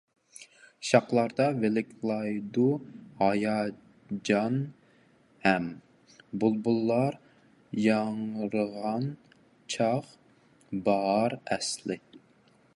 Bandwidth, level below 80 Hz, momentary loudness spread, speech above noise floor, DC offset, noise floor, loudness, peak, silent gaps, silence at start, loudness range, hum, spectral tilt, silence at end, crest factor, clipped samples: 11.5 kHz; -70 dBFS; 14 LU; 35 dB; under 0.1%; -62 dBFS; -29 LUFS; -6 dBFS; none; 0.4 s; 3 LU; none; -5.5 dB/octave; 0.6 s; 24 dB; under 0.1%